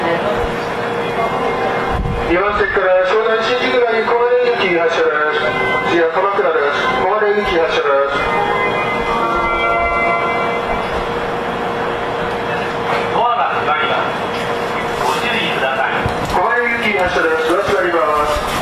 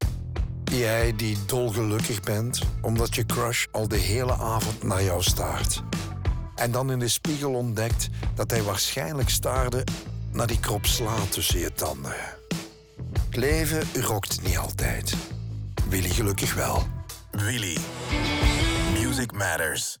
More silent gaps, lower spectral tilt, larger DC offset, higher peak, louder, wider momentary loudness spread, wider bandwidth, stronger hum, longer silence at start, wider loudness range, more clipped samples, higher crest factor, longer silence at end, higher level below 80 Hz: neither; about the same, -5 dB/octave vs -4 dB/octave; neither; first, -4 dBFS vs -8 dBFS; first, -16 LUFS vs -26 LUFS; second, 5 LU vs 8 LU; second, 14 kHz vs over 20 kHz; neither; about the same, 0 s vs 0 s; about the same, 3 LU vs 2 LU; neither; second, 12 dB vs 18 dB; about the same, 0 s vs 0.05 s; about the same, -36 dBFS vs -34 dBFS